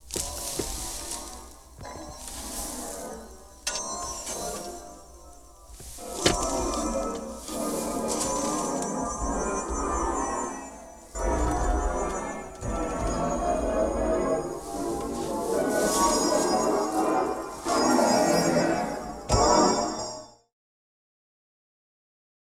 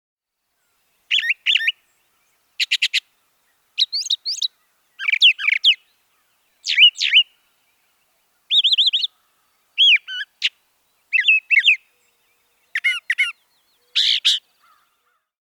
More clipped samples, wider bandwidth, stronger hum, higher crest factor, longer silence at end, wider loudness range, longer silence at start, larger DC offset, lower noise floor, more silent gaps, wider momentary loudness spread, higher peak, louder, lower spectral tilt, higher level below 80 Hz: neither; about the same, 19 kHz vs over 20 kHz; neither; about the same, 22 dB vs 18 dB; first, 2.25 s vs 1.1 s; first, 10 LU vs 6 LU; second, 0.05 s vs 1.1 s; neither; second, -48 dBFS vs -73 dBFS; neither; first, 17 LU vs 11 LU; about the same, -6 dBFS vs -4 dBFS; second, -27 LUFS vs -16 LUFS; first, -3.5 dB/octave vs 8 dB/octave; first, -40 dBFS vs -88 dBFS